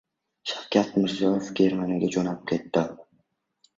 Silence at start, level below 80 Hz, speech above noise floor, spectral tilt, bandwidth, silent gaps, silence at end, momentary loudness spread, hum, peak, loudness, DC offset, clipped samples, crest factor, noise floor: 0.45 s; -62 dBFS; 46 dB; -6 dB/octave; 7.8 kHz; none; 0.75 s; 10 LU; none; -6 dBFS; -26 LUFS; under 0.1%; under 0.1%; 20 dB; -70 dBFS